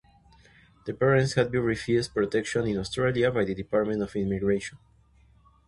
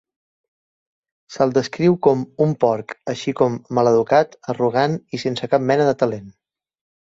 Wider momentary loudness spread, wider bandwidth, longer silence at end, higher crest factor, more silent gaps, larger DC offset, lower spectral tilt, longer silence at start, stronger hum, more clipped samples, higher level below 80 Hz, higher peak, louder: second, 6 LU vs 9 LU; first, 11.5 kHz vs 7.8 kHz; first, 0.9 s vs 0.7 s; about the same, 20 dB vs 18 dB; neither; neither; about the same, -6 dB/octave vs -6.5 dB/octave; second, 0.85 s vs 1.3 s; neither; neither; first, -52 dBFS vs -60 dBFS; second, -8 dBFS vs -2 dBFS; second, -26 LUFS vs -19 LUFS